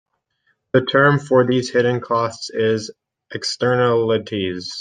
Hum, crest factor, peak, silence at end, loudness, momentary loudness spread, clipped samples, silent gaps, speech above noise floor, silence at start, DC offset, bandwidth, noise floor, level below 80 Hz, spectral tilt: none; 18 dB; -2 dBFS; 0 s; -18 LUFS; 10 LU; under 0.1%; none; 49 dB; 0.75 s; under 0.1%; 9.6 kHz; -67 dBFS; -60 dBFS; -5.5 dB/octave